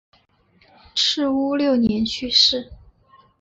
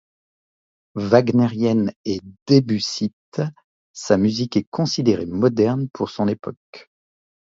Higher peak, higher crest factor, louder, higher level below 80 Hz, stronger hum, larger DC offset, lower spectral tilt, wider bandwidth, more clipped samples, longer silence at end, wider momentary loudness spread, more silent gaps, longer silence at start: second, -4 dBFS vs 0 dBFS; about the same, 18 dB vs 20 dB; about the same, -18 LUFS vs -20 LUFS; about the same, -50 dBFS vs -54 dBFS; neither; neither; second, -3.5 dB/octave vs -6.5 dB/octave; about the same, 8 kHz vs 7.8 kHz; neither; about the same, 0.65 s vs 0.6 s; second, 9 LU vs 12 LU; second, none vs 1.96-2.04 s, 2.42-2.46 s, 3.13-3.32 s, 3.64-3.94 s, 4.67-4.72 s, 6.57-6.73 s; about the same, 0.95 s vs 0.95 s